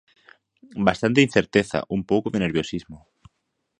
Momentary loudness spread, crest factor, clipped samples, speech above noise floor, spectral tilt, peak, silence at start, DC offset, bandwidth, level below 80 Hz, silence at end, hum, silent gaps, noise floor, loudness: 11 LU; 24 dB; under 0.1%; 54 dB; -6 dB/octave; 0 dBFS; 0.75 s; under 0.1%; 10.5 kHz; -52 dBFS; 0.85 s; none; none; -76 dBFS; -22 LUFS